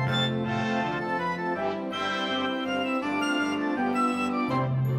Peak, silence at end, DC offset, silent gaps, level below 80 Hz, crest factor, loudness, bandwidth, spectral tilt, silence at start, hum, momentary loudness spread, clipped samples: -14 dBFS; 0 s; under 0.1%; none; -64 dBFS; 14 dB; -27 LUFS; 13.5 kHz; -6 dB/octave; 0 s; none; 3 LU; under 0.1%